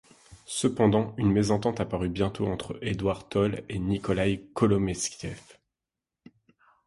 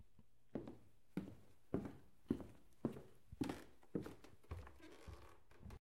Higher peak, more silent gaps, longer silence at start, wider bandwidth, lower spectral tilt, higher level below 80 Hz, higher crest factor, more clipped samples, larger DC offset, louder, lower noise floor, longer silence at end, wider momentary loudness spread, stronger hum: first, -8 dBFS vs -24 dBFS; neither; first, 0.3 s vs 0 s; second, 11.5 kHz vs 16 kHz; about the same, -6 dB/octave vs -7 dB/octave; first, -48 dBFS vs -66 dBFS; second, 20 dB vs 28 dB; neither; neither; first, -27 LUFS vs -51 LUFS; first, -89 dBFS vs -73 dBFS; first, 1.45 s vs 0 s; second, 9 LU vs 16 LU; neither